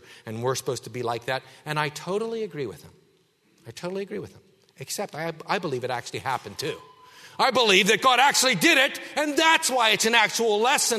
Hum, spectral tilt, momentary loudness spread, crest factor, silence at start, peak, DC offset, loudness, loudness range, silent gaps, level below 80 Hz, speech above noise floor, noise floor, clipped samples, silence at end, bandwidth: none; -2 dB/octave; 16 LU; 22 dB; 0.1 s; -4 dBFS; under 0.1%; -23 LUFS; 14 LU; none; -70 dBFS; 40 dB; -64 dBFS; under 0.1%; 0 s; 13.5 kHz